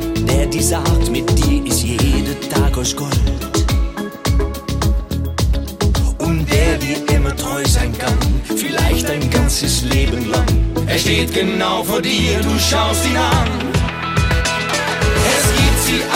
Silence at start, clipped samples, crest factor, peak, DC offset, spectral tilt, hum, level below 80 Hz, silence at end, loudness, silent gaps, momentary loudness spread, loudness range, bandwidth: 0 s; under 0.1%; 12 dB; -4 dBFS; under 0.1%; -4.5 dB/octave; none; -20 dBFS; 0 s; -16 LUFS; none; 5 LU; 3 LU; 17 kHz